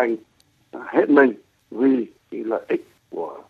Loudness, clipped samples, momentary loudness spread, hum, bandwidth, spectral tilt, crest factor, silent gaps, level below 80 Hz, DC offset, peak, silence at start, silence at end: -21 LUFS; under 0.1%; 21 LU; none; 4.8 kHz; -7.5 dB/octave; 22 dB; none; -72 dBFS; under 0.1%; 0 dBFS; 0 s; 0.1 s